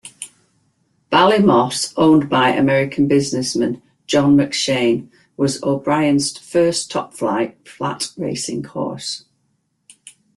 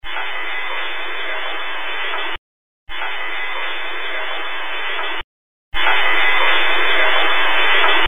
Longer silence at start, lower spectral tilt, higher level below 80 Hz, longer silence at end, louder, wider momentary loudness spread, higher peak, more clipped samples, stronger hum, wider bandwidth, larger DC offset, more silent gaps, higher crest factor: about the same, 0.05 s vs 0 s; about the same, -4.5 dB/octave vs -3.5 dB/octave; second, -56 dBFS vs -42 dBFS; first, 0.25 s vs 0 s; about the same, -17 LUFS vs -18 LUFS; about the same, 12 LU vs 11 LU; about the same, -2 dBFS vs 0 dBFS; neither; neither; second, 12.5 kHz vs 16.5 kHz; second, under 0.1% vs 8%; second, none vs 2.38-2.87 s, 5.24-5.72 s; about the same, 16 dB vs 18 dB